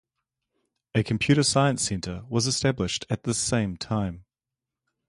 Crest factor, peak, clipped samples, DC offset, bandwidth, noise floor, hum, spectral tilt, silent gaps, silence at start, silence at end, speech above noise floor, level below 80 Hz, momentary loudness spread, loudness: 20 dB; -8 dBFS; under 0.1%; under 0.1%; 11.5 kHz; -89 dBFS; none; -4.5 dB/octave; none; 0.95 s; 0.9 s; 64 dB; -50 dBFS; 8 LU; -25 LUFS